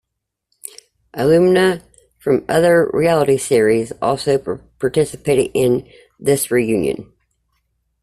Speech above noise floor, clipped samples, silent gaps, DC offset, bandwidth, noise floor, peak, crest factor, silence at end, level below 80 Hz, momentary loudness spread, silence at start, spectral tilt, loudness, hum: 63 dB; under 0.1%; none; under 0.1%; 14.5 kHz; -79 dBFS; -2 dBFS; 16 dB; 1 s; -50 dBFS; 14 LU; 1.15 s; -5.5 dB/octave; -16 LUFS; none